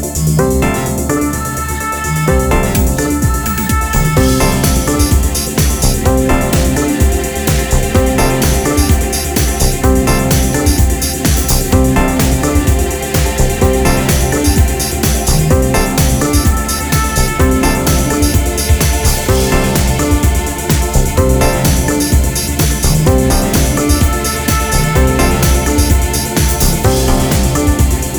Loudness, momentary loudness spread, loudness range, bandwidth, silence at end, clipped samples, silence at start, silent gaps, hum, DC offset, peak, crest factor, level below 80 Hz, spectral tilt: -12 LUFS; 3 LU; 1 LU; over 20 kHz; 0 s; under 0.1%; 0 s; none; none; under 0.1%; 0 dBFS; 12 dB; -16 dBFS; -4.5 dB/octave